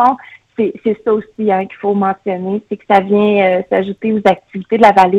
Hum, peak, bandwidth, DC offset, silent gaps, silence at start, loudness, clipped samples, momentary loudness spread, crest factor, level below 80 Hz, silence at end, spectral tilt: none; 0 dBFS; 9.2 kHz; under 0.1%; none; 0 s; -14 LUFS; 0.2%; 9 LU; 14 dB; -54 dBFS; 0 s; -7.5 dB/octave